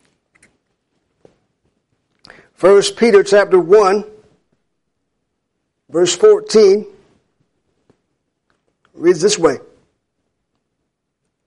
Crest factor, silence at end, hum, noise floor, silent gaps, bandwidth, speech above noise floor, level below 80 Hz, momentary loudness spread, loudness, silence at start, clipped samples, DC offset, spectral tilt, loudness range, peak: 16 dB; 1.9 s; none; -73 dBFS; none; 11.5 kHz; 62 dB; -58 dBFS; 8 LU; -12 LUFS; 2.6 s; under 0.1%; under 0.1%; -4 dB/octave; 6 LU; -2 dBFS